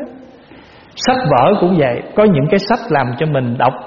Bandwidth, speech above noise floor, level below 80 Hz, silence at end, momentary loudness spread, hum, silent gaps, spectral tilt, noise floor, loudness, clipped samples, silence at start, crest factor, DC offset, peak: 7 kHz; 27 dB; -46 dBFS; 0 s; 6 LU; none; none; -5.5 dB/octave; -40 dBFS; -14 LUFS; under 0.1%; 0 s; 14 dB; under 0.1%; 0 dBFS